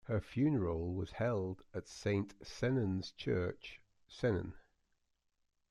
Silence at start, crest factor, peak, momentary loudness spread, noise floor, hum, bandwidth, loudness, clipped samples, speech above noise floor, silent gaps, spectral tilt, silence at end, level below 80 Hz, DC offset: 0.05 s; 16 dB; -22 dBFS; 12 LU; -82 dBFS; none; 11.5 kHz; -38 LUFS; under 0.1%; 45 dB; none; -7 dB/octave; 1.1 s; -62 dBFS; under 0.1%